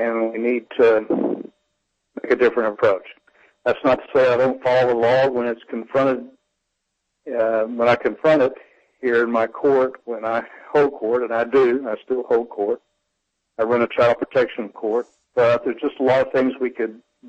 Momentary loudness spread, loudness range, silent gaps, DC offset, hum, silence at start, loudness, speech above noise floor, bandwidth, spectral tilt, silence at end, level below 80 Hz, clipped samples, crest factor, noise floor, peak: 10 LU; 2 LU; none; under 0.1%; none; 0 s; -20 LUFS; 57 dB; 8 kHz; -7 dB/octave; 0 s; -62 dBFS; under 0.1%; 14 dB; -76 dBFS; -6 dBFS